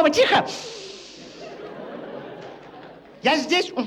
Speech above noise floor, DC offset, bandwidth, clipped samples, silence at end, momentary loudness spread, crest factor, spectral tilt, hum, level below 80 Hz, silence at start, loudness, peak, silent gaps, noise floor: 23 dB; under 0.1%; 14.5 kHz; under 0.1%; 0 s; 23 LU; 18 dB; -3 dB/octave; none; -64 dBFS; 0 s; -20 LUFS; -6 dBFS; none; -43 dBFS